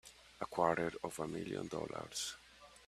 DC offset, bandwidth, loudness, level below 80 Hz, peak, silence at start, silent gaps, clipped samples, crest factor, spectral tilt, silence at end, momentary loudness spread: under 0.1%; 14.5 kHz; -40 LUFS; -68 dBFS; -18 dBFS; 0.05 s; none; under 0.1%; 24 dB; -4 dB/octave; 0 s; 17 LU